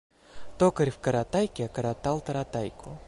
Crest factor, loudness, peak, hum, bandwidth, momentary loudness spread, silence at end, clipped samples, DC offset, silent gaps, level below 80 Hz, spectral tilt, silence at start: 18 dB; -29 LUFS; -10 dBFS; none; 11.5 kHz; 9 LU; 0.05 s; under 0.1%; under 0.1%; none; -52 dBFS; -6.5 dB/octave; 0.3 s